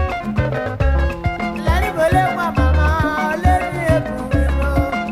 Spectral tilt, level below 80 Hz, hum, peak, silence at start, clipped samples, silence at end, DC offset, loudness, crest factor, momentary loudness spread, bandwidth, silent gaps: -7 dB/octave; -22 dBFS; none; -2 dBFS; 0 s; under 0.1%; 0 s; under 0.1%; -18 LUFS; 14 dB; 5 LU; 14.5 kHz; none